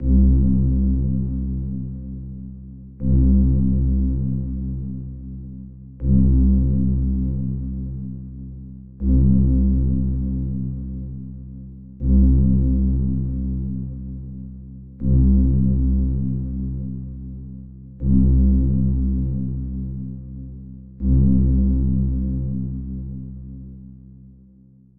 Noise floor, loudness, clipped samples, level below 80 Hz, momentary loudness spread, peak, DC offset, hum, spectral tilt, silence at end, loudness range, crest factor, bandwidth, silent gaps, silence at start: -50 dBFS; -21 LUFS; under 0.1%; -22 dBFS; 20 LU; -6 dBFS; 1%; none; -16 dB/octave; 0 s; 0 LU; 14 dB; 1.2 kHz; none; 0 s